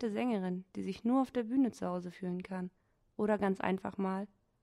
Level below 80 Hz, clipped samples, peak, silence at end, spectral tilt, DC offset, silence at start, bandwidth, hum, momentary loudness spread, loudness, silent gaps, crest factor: -70 dBFS; under 0.1%; -18 dBFS; 0.35 s; -7.5 dB/octave; under 0.1%; 0 s; 11.5 kHz; none; 10 LU; -36 LUFS; none; 18 dB